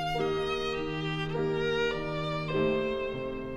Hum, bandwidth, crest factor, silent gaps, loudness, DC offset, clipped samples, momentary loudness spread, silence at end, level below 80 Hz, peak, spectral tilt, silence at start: none; 12 kHz; 14 dB; none; -31 LUFS; under 0.1%; under 0.1%; 4 LU; 0 s; -48 dBFS; -16 dBFS; -6 dB/octave; 0 s